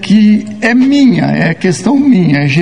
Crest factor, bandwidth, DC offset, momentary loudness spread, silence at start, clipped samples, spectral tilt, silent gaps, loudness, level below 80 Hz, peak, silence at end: 8 dB; 10.5 kHz; 0.9%; 4 LU; 0 s; 0.2%; -6.5 dB/octave; none; -9 LUFS; -48 dBFS; 0 dBFS; 0 s